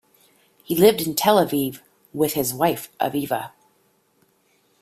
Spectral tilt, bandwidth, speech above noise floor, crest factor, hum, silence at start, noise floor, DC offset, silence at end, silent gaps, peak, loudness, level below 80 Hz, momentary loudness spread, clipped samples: -4.5 dB/octave; 16 kHz; 43 dB; 20 dB; none; 0.7 s; -63 dBFS; under 0.1%; 1.35 s; none; -2 dBFS; -21 LUFS; -60 dBFS; 11 LU; under 0.1%